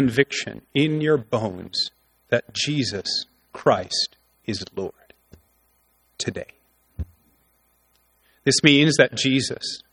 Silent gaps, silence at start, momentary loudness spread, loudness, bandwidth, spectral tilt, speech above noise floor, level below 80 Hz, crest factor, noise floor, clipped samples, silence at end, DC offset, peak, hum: none; 0 s; 20 LU; -22 LUFS; 13.5 kHz; -4 dB/octave; 42 dB; -50 dBFS; 24 dB; -64 dBFS; under 0.1%; 0.15 s; under 0.1%; 0 dBFS; none